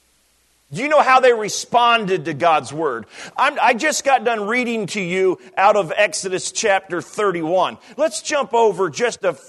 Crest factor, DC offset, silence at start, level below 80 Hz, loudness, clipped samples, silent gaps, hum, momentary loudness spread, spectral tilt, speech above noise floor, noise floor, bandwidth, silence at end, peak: 18 dB; under 0.1%; 0.7 s; -68 dBFS; -18 LUFS; under 0.1%; none; none; 8 LU; -3 dB/octave; 42 dB; -60 dBFS; 12.5 kHz; 0.1 s; -2 dBFS